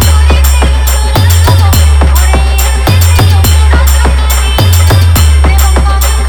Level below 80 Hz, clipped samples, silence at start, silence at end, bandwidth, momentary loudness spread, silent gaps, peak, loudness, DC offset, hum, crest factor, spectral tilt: -8 dBFS; 2%; 0 s; 0 s; over 20 kHz; 3 LU; none; 0 dBFS; -7 LUFS; under 0.1%; none; 4 dB; -4.5 dB/octave